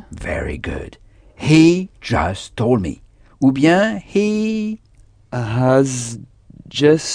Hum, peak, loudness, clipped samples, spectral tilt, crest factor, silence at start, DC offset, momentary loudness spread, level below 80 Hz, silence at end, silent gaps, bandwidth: none; 0 dBFS; -17 LUFS; under 0.1%; -6 dB/octave; 18 dB; 0.1 s; under 0.1%; 16 LU; -38 dBFS; 0 s; none; 10 kHz